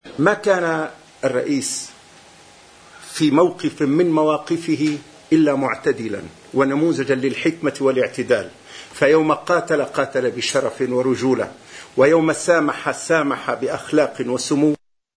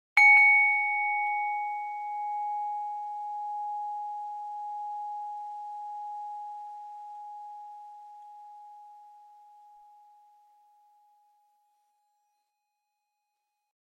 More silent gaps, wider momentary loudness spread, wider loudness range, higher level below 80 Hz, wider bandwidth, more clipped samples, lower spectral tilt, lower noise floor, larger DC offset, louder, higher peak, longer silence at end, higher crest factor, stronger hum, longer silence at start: neither; second, 10 LU vs 27 LU; second, 2 LU vs 24 LU; first, -62 dBFS vs under -90 dBFS; second, 11 kHz vs 12.5 kHz; neither; first, -5 dB/octave vs 5 dB/octave; second, -46 dBFS vs -82 dBFS; neither; first, -19 LUFS vs -26 LUFS; first, 0 dBFS vs -10 dBFS; second, 0.4 s vs 4.55 s; about the same, 20 dB vs 22 dB; neither; about the same, 0.05 s vs 0.15 s